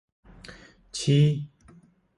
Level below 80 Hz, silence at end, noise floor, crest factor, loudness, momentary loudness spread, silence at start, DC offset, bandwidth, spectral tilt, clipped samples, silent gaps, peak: -58 dBFS; 0.7 s; -56 dBFS; 16 dB; -24 LUFS; 25 LU; 0.5 s; under 0.1%; 11.5 kHz; -6.5 dB/octave; under 0.1%; none; -10 dBFS